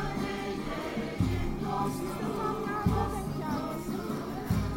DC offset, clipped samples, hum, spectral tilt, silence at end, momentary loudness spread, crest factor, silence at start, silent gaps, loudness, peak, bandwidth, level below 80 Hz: under 0.1%; under 0.1%; none; -6.5 dB/octave; 0 s; 5 LU; 18 dB; 0 s; none; -33 LUFS; -14 dBFS; 16.5 kHz; -42 dBFS